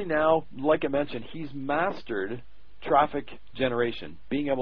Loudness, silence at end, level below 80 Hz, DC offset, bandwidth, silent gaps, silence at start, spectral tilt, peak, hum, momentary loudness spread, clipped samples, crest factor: -28 LUFS; 0 s; -54 dBFS; 1%; 5.4 kHz; none; 0 s; -8.5 dB/octave; -8 dBFS; none; 14 LU; under 0.1%; 20 dB